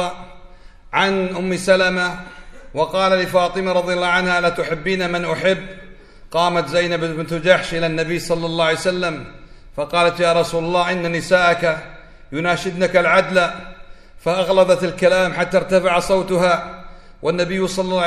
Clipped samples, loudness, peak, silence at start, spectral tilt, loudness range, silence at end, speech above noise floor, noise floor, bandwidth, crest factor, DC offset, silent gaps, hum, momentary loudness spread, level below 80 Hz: under 0.1%; -18 LUFS; 0 dBFS; 0 s; -4.5 dB/octave; 2 LU; 0 s; 23 dB; -40 dBFS; 13.5 kHz; 18 dB; under 0.1%; none; none; 10 LU; -42 dBFS